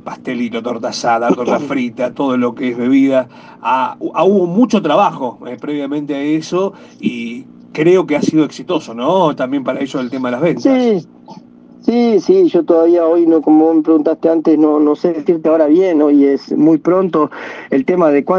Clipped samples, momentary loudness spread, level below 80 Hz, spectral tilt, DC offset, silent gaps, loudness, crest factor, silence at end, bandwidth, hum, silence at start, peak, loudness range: under 0.1%; 10 LU; -62 dBFS; -6.5 dB/octave; under 0.1%; none; -14 LUFS; 14 dB; 0 s; 7.8 kHz; none; 0.05 s; 0 dBFS; 5 LU